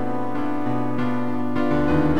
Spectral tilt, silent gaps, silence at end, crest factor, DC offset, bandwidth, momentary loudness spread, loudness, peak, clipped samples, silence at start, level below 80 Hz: -8.5 dB/octave; none; 0 s; 14 dB; 7%; 9 kHz; 6 LU; -24 LUFS; -8 dBFS; under 0.1%; 0 s; -42 dBFS